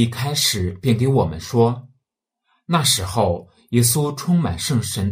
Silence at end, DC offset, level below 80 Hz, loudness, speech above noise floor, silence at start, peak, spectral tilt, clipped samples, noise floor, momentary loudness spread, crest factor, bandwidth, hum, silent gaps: 0 s; under 0.1%; -46 dBFS; -19 LUFS; 60 dB; 0 s; -2 dBFS; -4.5 dB/octave; under 0.1%; -79 dBFS; 5 LU; 18 dB; 16 kHz; none; none